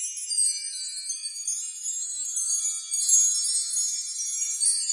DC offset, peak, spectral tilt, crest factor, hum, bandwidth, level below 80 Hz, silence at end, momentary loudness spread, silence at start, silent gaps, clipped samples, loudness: under 0.1%; -8 dBFS; 11 dB/octave; 20 dB; none; 11.5 kHz; under -90 dBFS; 0 s; 11 LU; 0 s; none; under 0.1%; -24 LUFS